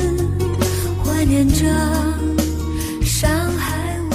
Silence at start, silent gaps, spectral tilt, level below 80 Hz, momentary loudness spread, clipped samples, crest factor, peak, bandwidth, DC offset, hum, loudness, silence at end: 0 s; none; -5.5 dB/octave; -26 dBFS; 6 LU; under 0.1%; 14 dB; -4 dBFS; 15.5 kHz; under 0.1%; none; -19 LUFS; 0 s